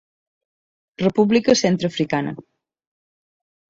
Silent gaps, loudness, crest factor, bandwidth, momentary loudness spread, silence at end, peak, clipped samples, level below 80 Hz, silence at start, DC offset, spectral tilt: none; -19 LUFS; 18 dB; 8 kHz; 11 LU; 1.3 s; -4 dBFS; under 0.1%; -58 dBFS; 1 s; under 0.1%; -5 dB/octave